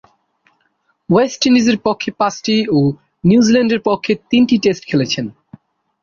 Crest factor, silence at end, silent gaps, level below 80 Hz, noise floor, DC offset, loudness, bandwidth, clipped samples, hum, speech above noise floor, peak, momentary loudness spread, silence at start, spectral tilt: 14 dB; 0.75 s; none; -52 dBFS; -63 dBFS; under 0.1%; -15 LUFS; 7.2 kHz; under 0.1%; none; 50 dB; -2 dBFS; 7 LU; 1.1 s; -5.5 dB/octave